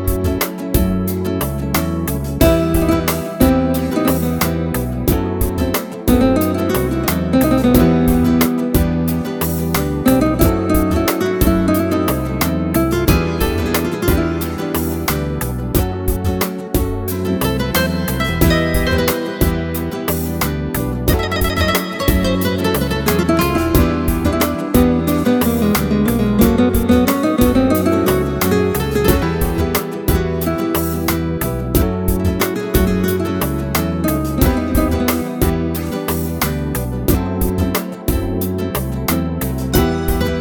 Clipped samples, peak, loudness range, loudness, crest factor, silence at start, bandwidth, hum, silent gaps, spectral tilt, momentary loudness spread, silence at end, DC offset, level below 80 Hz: under 0.1%; 0 dBFS; 4 LU; -17 LUFS; 16 dB; 0 s; 19 kHz; none; none; -6 dB/octave; 6 LU; 0 s; under 0.1%; -26 dBFS